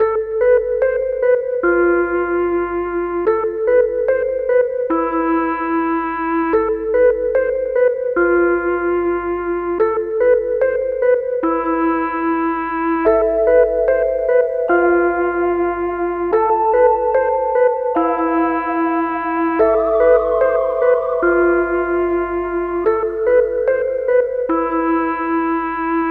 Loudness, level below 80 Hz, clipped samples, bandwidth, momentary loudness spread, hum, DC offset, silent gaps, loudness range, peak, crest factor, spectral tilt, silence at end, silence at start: -17 LUFS; -42 dBFS; under 0.1%; 4.2 kHz; 5 LU; 50 Hz at -50 dBFS; under 0.1%; none; 2 LU; -2 dBFS; 14 dB; -9 dB/octave; 0 s; 0 s